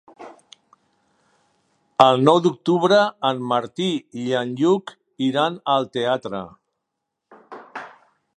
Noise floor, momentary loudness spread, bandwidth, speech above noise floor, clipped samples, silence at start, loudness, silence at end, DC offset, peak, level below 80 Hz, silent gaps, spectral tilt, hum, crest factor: -80 dBFS; 21 LU; 10.5 kHz; 61 dB; under 0.1%; 0.2 s; -20 LUFS; 0.5 s; under 0.1%; 0 dBFS; -68 dBFS; none; -6 dB/octave; none; 22 dB